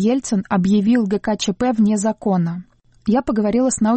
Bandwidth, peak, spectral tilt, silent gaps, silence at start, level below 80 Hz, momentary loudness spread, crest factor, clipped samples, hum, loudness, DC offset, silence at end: 8.8 kHz; -8 dBFS; -6 dB/octave; none; 0 s; -48 dBFS; 5 LU; 10 dB; under 0.1%; none; -18 LUFS; under 0.1%; 0 s